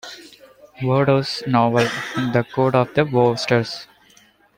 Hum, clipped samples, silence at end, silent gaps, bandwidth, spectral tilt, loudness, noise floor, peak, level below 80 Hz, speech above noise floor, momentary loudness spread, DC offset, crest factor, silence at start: none; under 0.1%; 0.75 s; none; 16.5 kHz; -6.5 dB/octave; -19 LUFS; -54 dBFS; -2 dBFS; -56 dBFS; 35 dB; 11 LU; under 0.1%; 18 dB; 0.05 s